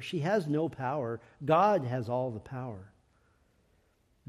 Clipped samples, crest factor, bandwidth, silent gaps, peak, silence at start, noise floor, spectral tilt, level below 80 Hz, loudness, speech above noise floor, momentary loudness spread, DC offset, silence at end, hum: under 0.1%; 18 dB; 13 kHz; none; -14 dBFS; 0 s; -70 dBFS; -7.5 dB/octave; -68 dBFS; -31 LUFS; 39 dB; 15 LU; under 0.1%; 1.45 s; none